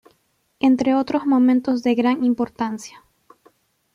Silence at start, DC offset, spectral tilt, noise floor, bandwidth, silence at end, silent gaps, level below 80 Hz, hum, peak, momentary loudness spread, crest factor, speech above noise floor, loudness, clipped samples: 0.65 s; under 0.1%; -5.5 dB/octave; -66 dBFS; 10 kHz; 1.05 s; none; -62 dBFS; none; -6 dBFS; 10 LU; 14 dB; 47 dB; -19 LUFS; under 0.1%